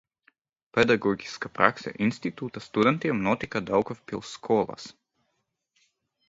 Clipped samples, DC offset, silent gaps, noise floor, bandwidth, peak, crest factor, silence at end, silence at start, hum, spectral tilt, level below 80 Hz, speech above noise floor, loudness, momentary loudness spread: under 0.1%; under 0.1%; none; -78 dBFS; 7.8 kHz; 0 dBFS; 28 dB; 1.4 s; 0.75 s; none; -6 dB/octave; -60 dBFS; 52 dB; -27 LUFS; 13 LU